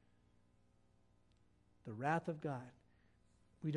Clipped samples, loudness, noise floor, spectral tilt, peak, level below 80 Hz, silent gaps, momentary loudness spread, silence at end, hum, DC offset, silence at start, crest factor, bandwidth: under 0.1%; -43 LUFS; -72 dBFS; -7.5 dB/octave; -22 dBFS; -78 dBFS; none; 18 LU; 0 s; 60 Hz at -70 dBFS; under 0.1%; 1.85 s; 24 dB; 10.5 kHz